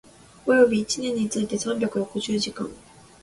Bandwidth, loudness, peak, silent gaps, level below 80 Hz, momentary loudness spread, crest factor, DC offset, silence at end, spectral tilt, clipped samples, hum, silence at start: 11.5 kHz; -24 LUFS; -6 dBFS; none; -58 dBFS; 12 LU; 18 dB; under 0.1%; 0.45 s; -4 dB/octave; under 0.1%; none; 0.45 s